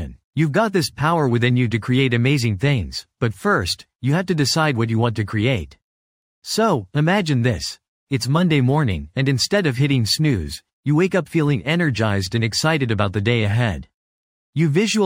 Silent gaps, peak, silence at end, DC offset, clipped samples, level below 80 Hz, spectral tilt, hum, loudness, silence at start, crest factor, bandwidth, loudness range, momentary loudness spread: 0.24-0.33 s, 3.95-3.99 s, 5.83-6.42 s, 7.88-8.07 s, 10.73-10.83 s, 13.94-14.53 s; -2 dBFS; 0 s; under 0.1%; under 0.1%; -44 dBFS; -5.5 dB/octave; none; -19 LUFS; 0 s; 18 dB; 16.5 kHz; 2 LU; 8 LU